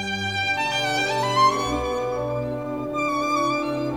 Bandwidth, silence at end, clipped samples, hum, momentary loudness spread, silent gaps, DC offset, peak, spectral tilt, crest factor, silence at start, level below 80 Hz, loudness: 19 kHz; 0 s; under 0.1%; none; 8 LU; none; 0.2%; -8 dBFS; -4 dB/octave; 16 dB; 0 s; -46 dBFS; -23 LUFS